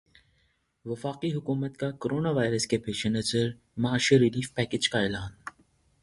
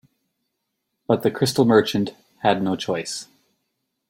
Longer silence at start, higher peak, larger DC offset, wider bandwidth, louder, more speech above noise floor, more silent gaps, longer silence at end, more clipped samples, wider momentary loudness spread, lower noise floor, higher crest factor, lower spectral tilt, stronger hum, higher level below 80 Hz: second, 0.85 s vs 1.1 s; second, -8 dBFS vs -2 dBFS; neither; second, 11.5 kHz vs 16.5 kHz; second, -28 LUFS vs -21 LUFS; second, 43 dB vs 57 dB; neither; second, 0.5 s vs 0.85 s; neither; about the same, 14 LU vs 13 LU; second, -71 dBFS vs -77 dBFS; about the same, 20 dB vs 20 dB; about the same, -5 dB/octave vs -5 dB/octave; neither; first, -56 dBFS vs -62 dBFS